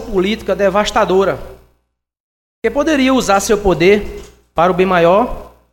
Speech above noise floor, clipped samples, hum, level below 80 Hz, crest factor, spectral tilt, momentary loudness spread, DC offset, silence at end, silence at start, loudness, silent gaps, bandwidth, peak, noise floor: 55 dB; under 0.1%; none; -34 dBFS; 14 dB; -5 dB/octave; 12 LU; under 0.1%; 0.25 s; 0 s; -14 LUFS; 2.20-2.62 s; 16.5 kHz; 0 dBFS; -67 dBFS